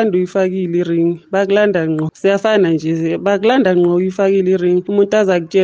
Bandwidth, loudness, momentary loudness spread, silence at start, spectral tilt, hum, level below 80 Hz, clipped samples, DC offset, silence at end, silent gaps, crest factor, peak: 7.6 kHz; -14 LUFS; 4 LU; 0 s; -7 dB/octave; none; -60 dBFS; under 0.1%; under 0.1%; 0 s; none; 12 dB; -2 dBFS